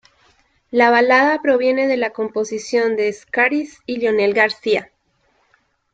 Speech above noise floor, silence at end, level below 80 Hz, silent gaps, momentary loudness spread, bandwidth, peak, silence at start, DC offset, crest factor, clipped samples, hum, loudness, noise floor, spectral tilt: 46 dB; 1.1 s; -64 dBFS; none; 9 LU; 8.8 kHz; -2 dBFS; 0.75 s; under 0.1%; 16 dB; under 0.1%; none; -17 LUFS; -63 dBFS; -4 dB/octave